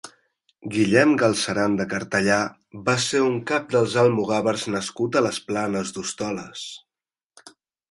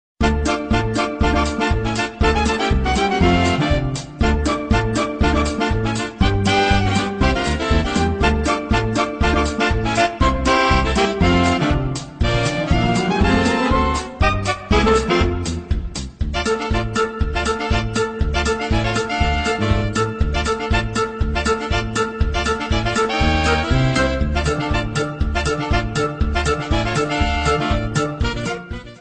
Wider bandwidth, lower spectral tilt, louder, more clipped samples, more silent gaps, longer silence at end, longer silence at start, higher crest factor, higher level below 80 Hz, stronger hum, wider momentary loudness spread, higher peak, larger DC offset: first, 11.5 kHz vs 9.4 kHz; about the same, -4.5 dB/octave vs -5.5 dB/octave; second, -22 LUFS vs -19 LUFS; neither; first, 7.26-7.30 s vs none; first, 0.4 s vs 0 s; second, 0.05 s vs 0.2 s; first, 22 dB vs 14 dB; second, -60 dBFS vs -24 dBFS; neither; first, 12 LU vs 6 LU; about the same, -2 dBFS vs -4 dBFS; second, under 0.1% vs 0.3%